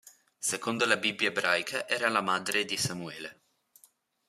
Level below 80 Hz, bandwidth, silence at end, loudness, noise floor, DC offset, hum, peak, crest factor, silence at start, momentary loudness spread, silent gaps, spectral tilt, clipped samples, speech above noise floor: -74 dBFS; 15 kHz; 0.95 s; -29 LUFS; -65 dBFS; under 0.1%; none; -6 dBFS; 26 dB; 0.05 s; 12 LU; none; -2 dB/octave; under 0.1%; 35 dB